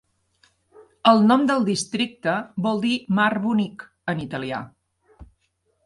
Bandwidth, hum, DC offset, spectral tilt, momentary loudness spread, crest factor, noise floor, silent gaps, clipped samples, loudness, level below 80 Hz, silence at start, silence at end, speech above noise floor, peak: 11.5 kHz; none; under 0.1%; -5 dB/octave; 14 LU; 20 dB; -70 dBFS; none; under 0.1%; -22 LUFS; -58 dBFS; 1.05 s; 0.6 s; 49 dB; -4 dBFS